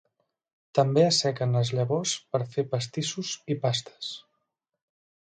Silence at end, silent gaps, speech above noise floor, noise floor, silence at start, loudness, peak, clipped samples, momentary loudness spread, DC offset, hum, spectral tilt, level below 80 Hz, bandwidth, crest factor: 1.05 s; none; 53 dB; -80 dBFS; 0.75 s; -27 LUFS; -10 dBFS; under 0.1%; 13 LU; under 0.1%; none; -4.5 dB/octave; -70 dBFS; 9.4 kHz; 18 dB